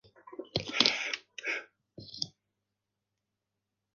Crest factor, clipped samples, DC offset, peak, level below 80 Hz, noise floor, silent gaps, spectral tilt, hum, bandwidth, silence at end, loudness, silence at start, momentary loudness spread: 34 dB; under 0.1%; under 0.1%; -4 dBFS; -68 dBFS; -86 dBFS; none; -2 dB/octave; none; 10 kHz; 1.65 s; -32 LUFS; 0.25 s; 21 LU